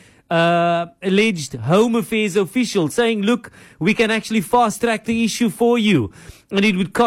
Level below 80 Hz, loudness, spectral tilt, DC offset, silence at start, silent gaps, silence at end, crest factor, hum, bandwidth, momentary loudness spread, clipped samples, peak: -52 dBFS; -18 LUFS; -5 dB/octave; under 0.1%; 0.3 s; none; 0 s; 12 dB; none; 15.5 kHz; 5 LU; under 0.1%; -6 dBFS